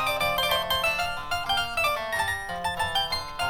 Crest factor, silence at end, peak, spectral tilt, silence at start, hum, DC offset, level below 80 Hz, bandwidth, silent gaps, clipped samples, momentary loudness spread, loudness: 16 dB; 0 s; -12 dBFS; -2 dB/octave; 0 s; none; under 0.1%; -46 dBFS; over 20 kHz; none; under 0.1%; 5 LU; -26 LUFS